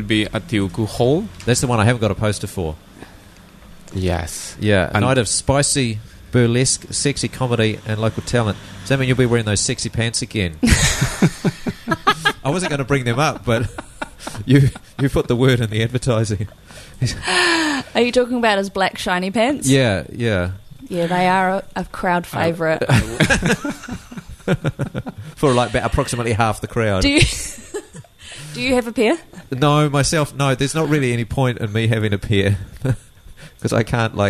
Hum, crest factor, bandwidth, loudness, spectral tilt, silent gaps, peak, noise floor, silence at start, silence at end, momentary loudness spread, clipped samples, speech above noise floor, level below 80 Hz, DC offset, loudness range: none; 18 dB; 13.5 kHz; -18 LUFS; -4.5 dB/octave; none; 0 dBFS; -43 dBFS; 0 s; 0 s; 12 LU; under 0.1%; 25 dB; -36 dBFS; under 0.1%; 3 LU